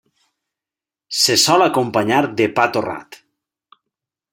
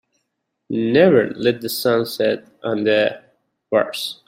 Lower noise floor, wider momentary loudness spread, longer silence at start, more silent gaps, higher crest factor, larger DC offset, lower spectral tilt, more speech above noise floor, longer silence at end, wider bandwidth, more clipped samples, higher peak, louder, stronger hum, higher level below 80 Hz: first, -89 dBFS vs -75 dBFS; about the same, 12 LU vs 11 LU; first, 1.1 s vs 0.7 s; neither; about the same, 18 dB vs 18 dB; neither; second, -3 dB/octave vs -5 dB/octave; first, 73 dB vs 57 dB; first, 1.2 s vs 0.15 s; about the same, 16.5 kHz vs 16 kHz; neither; about the same, 0 dBFS vs -2 dBFS; first, -16 LUFS vs -19 LUFS; neither; about the same, -64 dBFS vs -62 dBFS